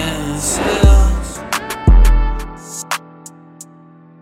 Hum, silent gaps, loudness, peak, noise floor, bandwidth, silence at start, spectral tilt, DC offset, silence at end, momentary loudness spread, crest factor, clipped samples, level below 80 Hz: none; none; -16 LUFS; 0 dBFS; -42 dBFS; 15.5 kHz; 0 s; -4.5 dB/octave; under 0.1%; 0.6 s; 16 LU; 14 dB; under 0.1%; -16 dBFS